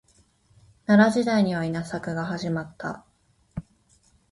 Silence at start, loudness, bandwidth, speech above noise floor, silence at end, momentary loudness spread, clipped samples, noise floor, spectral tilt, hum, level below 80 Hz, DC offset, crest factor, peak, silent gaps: 0.9 s; -24 LUFS; 11.5 kHz; 39 dB; 0.7 s; 21 LU; under 0.1%; -62 dBFS; -6.5 dB/octave; none; -56 dBFS; under 0.1%; 22 dB; -4 dBFS; none